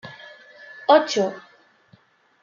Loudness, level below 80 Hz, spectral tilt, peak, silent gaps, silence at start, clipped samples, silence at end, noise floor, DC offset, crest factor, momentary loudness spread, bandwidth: -20 LUFS; -80 dBFS; -3.5 dB/octave; -2 dBFS; none; 0.05 s; under 0.1%; 1.05 s; -57 dBFS; under 0.1%; 22 dB; 26 LU; 7.4 kHz